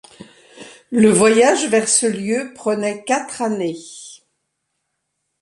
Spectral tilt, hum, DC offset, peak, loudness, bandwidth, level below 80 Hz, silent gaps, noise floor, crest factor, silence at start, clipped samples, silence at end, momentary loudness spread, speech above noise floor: -3.5 dB/octave; none; under 0.1%; -2 dBFS; -17 LUFS; 11.5 kHz; -62 dBFS; none; -74 dBFS; 18 dB; 0.2 s; under 0.1%; 1.25 s; 13 LU; 58 dB